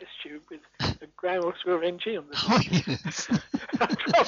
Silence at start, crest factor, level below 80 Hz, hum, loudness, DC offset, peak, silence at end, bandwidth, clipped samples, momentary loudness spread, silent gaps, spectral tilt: 0 s; 16 dB; -56 dBFS; none; -28 LUFS; under 0.1%; -10 dBFS; 0 s; 7.4 kHz; under 0.1%; 17 LU; none; -4 dB/octave